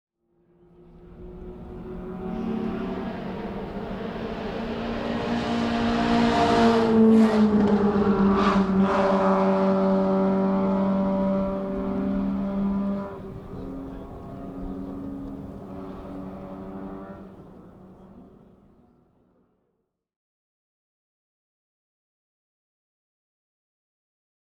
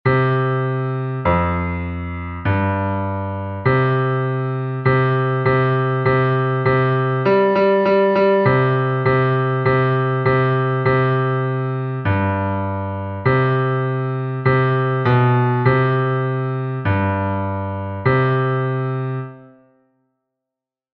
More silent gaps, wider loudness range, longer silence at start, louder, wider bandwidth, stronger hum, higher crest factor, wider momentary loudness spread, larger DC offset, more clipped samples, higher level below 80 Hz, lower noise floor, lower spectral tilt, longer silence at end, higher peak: neither; first, 19 LU vs 5 LU; first, 1 s vs 0.05 s; second, -23 LUFS vs -18 LUFS; first, 9 kHz vs 5 kHz; neither; about the same, 18 dB vs 16 dB; first, 19 LU vs 8 LU; neither; neither; about the same, -46 dBFS vs -44 dBFS; second, -77 dBFS vs -86 dBFS; second, -7.5 dB/octave vs -10.5 dB/octave; first, 6.2 s vs 1.5 s; second, -8 dBFS vs -2 dBFS